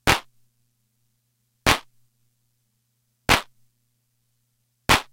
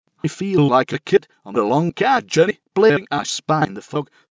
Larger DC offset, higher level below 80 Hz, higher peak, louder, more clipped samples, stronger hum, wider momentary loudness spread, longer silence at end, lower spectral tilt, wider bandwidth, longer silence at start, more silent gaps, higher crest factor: neither; first, -40 dBFS vs -58 dBFS; about the same, 0 dBFS vs -2 dBFS; second, -22 LUFS vs -19 LUFS; neither; first, 60 Hz at -55 dBFS vs none; about the same, 9 LU vs 10 LU; second, 0.1 s vs 0.3 s; second, -2.5 dB/octave vs -5.5 dB/octave; first, 16.5 kHz vs 8 kHz; second, 0.05 s vs 0.25 s; neither; first, 28 dB vs 16 dB